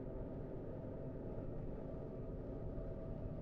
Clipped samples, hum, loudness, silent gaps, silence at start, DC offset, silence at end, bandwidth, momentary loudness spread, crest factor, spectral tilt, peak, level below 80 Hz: under 0.1%; none; -48 LUFS; none; 0 s; under 0.1%; 0 s; 4.7 kHz; 1 LU; 12 dB; -10.5 dB/octave; -34 dBFS; -50 dBFS